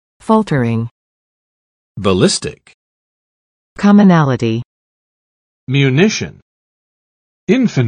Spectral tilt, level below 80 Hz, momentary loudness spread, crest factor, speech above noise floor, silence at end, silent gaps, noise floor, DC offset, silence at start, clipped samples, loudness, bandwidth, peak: -6 dB/octave; -50 dBFS; 14 LU; 16 dB; over 78 dB; 0 s; 0.91-1.95 s, 2.74-3.76 s, 4.65-5.67 s, 6.42-7.47 s; under -90 dBFS; under 0.1%; 0.3 s; under 0.1%; -13 LUFS; 10.5 kHz; 0 dBFS